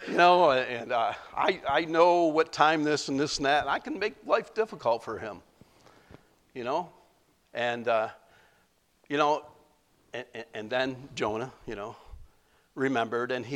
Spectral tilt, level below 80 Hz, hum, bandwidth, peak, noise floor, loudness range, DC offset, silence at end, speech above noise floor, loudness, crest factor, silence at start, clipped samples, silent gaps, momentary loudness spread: -4.5 dB/octave; -60 dBFS; none; 12 kHz; -8 dBFS; -68 dBFS; 9 LU; under 0.1%; 0 s; 40 dB; -27 LUFS; 22 dB; 0 s; under 0.1%; none; 18 LU